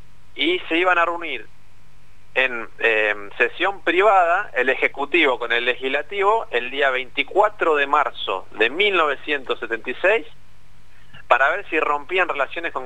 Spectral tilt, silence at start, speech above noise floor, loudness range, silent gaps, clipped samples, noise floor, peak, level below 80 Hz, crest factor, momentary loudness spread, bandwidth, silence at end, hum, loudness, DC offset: -4 dB/octave; 0.35 s; 32 dB; 3 LU; none; under 0.1%; -53 dBFS; -2 dBFS; -56 dBFS; 20 dB; 7 LU; 9.6 kHz; 0 s; 50 Hz at -60 dBFS; -20 LUFS; 2%